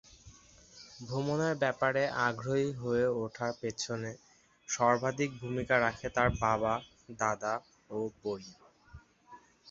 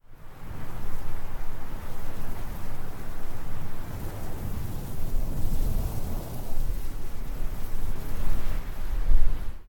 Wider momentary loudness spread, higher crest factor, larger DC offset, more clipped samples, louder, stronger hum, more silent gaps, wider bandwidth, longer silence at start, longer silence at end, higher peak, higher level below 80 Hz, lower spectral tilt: first, 14 LU vs 9 LU; first, 22 dB vs 16 dB; neither; neither; first, -33 LUFS vs -36 LUFS; neither; neither; second, 7.6 kHz vs 17 kHz; first, 0.25 s vs 0.1 s; about the same, 0 s vs 0.05 s; second, -12 dBFS vs -6 dBFS; second, -56 dBFS vs -28 dBFS; second, -4.5 dB/octave vs -6 dB/octave